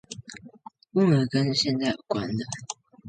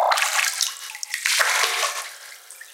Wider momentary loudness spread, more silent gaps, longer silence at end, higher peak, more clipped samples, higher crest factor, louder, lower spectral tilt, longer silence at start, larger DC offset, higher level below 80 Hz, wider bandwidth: about the same, 19 LU vs 20 LU; neither; about the same, 0 s vs 0 s; second, -10 dBFS vs -2 dBFS; neither; second, 16 dB vs 22 dB; second, -25 LUFS vs -21 LUFS; first, -5.5 dB/octave vs 6 dB/octave; about the same, 0.1 s vs 0 s; neither; first, -60 dBFS vs under -90 dBFS; second, 9.4 kHz vs 17 kHz